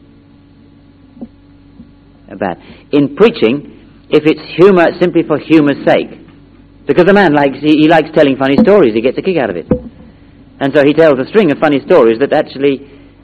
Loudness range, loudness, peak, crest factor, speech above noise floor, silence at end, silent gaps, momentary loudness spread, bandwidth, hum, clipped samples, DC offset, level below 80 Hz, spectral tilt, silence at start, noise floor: 6 LU; -10 LUFS; 0 dBFS; 12 dB; 32 dB; 0.4 s; none; 11 LU; 7.6 kHz; none; 1%; under 0.1%; -42 dBFS; -8 dB/octave; 1.2 s; -42 dBFS